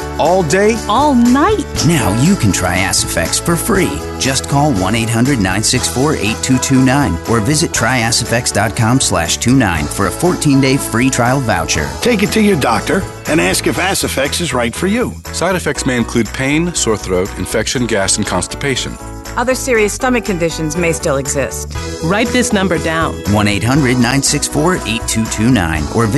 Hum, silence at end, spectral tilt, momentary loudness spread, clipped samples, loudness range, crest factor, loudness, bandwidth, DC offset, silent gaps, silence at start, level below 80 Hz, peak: none; 0 s; -4 dB/octave; 5 LU; under 0.1%; 3 LU; 12 dB; -13 LUFS; 12.5 kHz; under 0.1%; none; 0 s; -30 dBFS; -2 dBFS